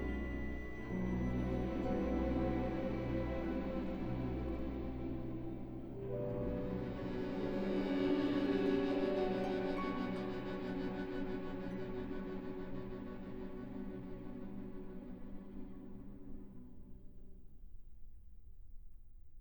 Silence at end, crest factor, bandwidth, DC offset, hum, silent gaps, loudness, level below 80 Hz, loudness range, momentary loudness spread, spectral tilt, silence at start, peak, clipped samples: 0 s; 16 dB; over 20 kHz; 0.1%; none; none; -40 LUFS; -50 dBFS; 17 LU; 16 LU; -8.5 dB/octave; 0 s; -22 dBFS; under 0.1%